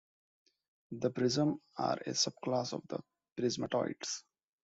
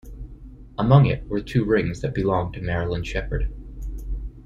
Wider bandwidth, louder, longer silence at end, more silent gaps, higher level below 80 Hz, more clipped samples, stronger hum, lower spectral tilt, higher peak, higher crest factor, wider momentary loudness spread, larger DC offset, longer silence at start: about the same, 8.2 kHz vs 7.6 kHz; second, -35 LUFS vs -23 LUFS; first, 0.45 s vs 0 s; first, 3.32-3.36 s vs none; second, -74 dBFS vs -34 dBFS; neither; neither; second, -4 dB/octave vs -8 dB/octave; second, -18 dBFS vs -4 dBFS; about the same, 20 dB vs 20 dB; second, 12 LU vs 20 LU; neither; first, 0.9 s vs 0.05 s